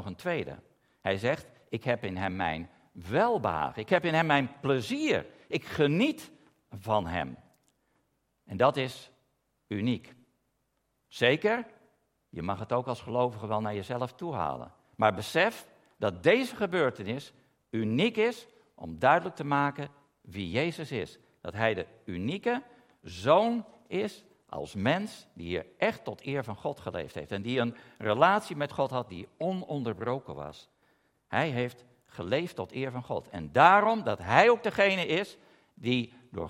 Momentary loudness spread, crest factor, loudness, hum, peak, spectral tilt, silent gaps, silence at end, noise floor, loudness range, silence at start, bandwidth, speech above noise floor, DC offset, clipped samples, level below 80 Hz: 17 LU; 26 dB; -29 LUFS; none; -4 dBFS; -6 dB/octave; none; 0 s; -77 dBFS; 8 LU; 0 s; 16 kHz; 48 dB; under 0.1%; under 0.1%; -66 dBFS